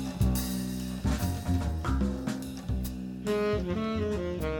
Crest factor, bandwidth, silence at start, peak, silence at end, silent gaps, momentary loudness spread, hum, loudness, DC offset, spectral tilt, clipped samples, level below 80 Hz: 14 dB; 17.5 kHz; 0 s; -16 dBFS; 0 s; none; 6 LU; none; -31 LUFS; under 0.1%; -6.5 dB/octave; under 0.1%; -36 dBFS